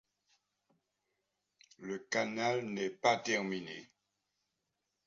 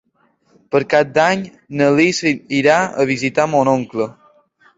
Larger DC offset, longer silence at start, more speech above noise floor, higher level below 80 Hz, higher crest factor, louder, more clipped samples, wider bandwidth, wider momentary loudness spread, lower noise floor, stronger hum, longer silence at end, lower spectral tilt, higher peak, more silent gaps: neither; first, 1.8 s vs 0.7 s; first, 51 dB vs 44 dB; second, -82 dBFS vs -58 dBFS; first, 24 dB vs 16 dB; second, -35 LUFS vs -16 LUFS; neither; about the same, 7.4 kHz vs 8 kHz; first, 15 LU vs 9 LU; first, -86 dBFS vs -60 dBFS; first, 50 Hz at -65 dBFS vs none; first, 1.2 s vs 0.7 s; second, -2.5 dB/octave vs -5 dB/octave; second, -16 dBFS vs 0 dBFS; neither